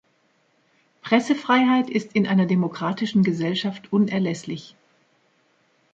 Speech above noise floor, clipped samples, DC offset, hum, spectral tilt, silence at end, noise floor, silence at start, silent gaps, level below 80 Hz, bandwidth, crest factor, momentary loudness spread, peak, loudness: 44 dB; under 0.1%; under 0.1%; none; -6.5 dB/octave; 1.3 s; -65 dBFS; 1.05 s; none; -68 dBFS; 7.8 kHz; 20 dB; 9 LU; -4 dBFS; -22 LUFS